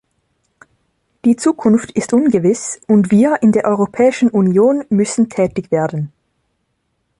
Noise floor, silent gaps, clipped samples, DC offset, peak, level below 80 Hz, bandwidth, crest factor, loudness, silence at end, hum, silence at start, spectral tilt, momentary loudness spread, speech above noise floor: -68 dBFS; none; under 0.1%; under 0.1%; -2 dBFS; -54 dBFS; 11 kHz; 12 dB; -14 LUFS; 1.1 s; none; 1.25 s; -6.5 dB/octave; 6 LU; 54 dB